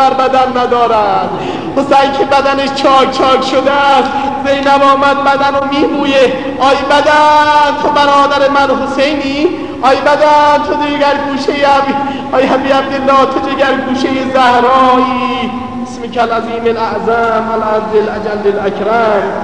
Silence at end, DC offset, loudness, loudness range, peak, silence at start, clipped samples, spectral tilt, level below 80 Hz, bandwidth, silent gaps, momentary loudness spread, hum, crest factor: 0 s; 1%; -10 LUFS; 4 LU; 0 dBFS; 0 s; 0.1%; -4.5 dB/octave; -42 dBFS; 10.5 kHz; none; 7 LU; none; 10 dB